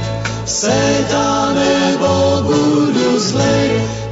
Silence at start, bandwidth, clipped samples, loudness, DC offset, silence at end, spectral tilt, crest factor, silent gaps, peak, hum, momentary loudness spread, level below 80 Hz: 0 s; 8 kHz; under 0.1%; -14 LUFS; under 0.1%; 0 s; -4.5 dB/octave; 10 dB; none; -4 dBFS; none; 4 LU; -38 dBFS